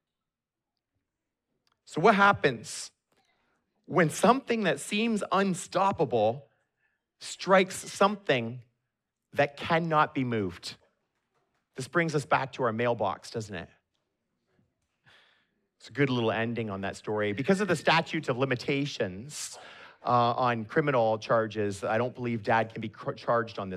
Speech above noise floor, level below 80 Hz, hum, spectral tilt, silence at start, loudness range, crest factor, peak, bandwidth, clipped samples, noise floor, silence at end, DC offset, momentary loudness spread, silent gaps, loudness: 61 dB; -70 dBFS; none; -5 dB/octave; 1.9 s; 6 LU; 22 dB; -8 dBFS; 14.5 kHz; under 0.1%; -89 dBFS; 0 s; under 0.1%; 14 LU; none; -28 LUFS